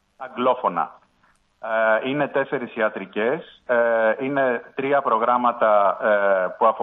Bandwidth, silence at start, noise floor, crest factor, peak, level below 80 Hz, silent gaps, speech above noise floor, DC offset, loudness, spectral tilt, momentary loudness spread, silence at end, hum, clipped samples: 4 kHz; 0.2 s; -62 dBFS; 16 dB; -6 dBFS; -72 dBFS; none; 41 dB; under 0.1%; -21 LUFS; -8 dB/octave; 8 LU; 0 s; none; under 0.1%